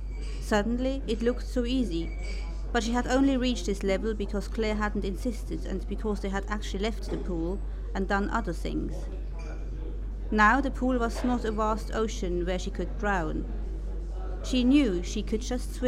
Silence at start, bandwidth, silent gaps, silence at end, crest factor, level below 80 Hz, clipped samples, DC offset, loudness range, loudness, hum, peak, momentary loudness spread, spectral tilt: 0 s; 12.5 kHz; none; 0 s; 20 dB; -34 dBFS; under 0.1%; under 0.1%; 5 LU; -29 LUFS; none; -8 dBFS; 13 LU; -5.5 dB/octave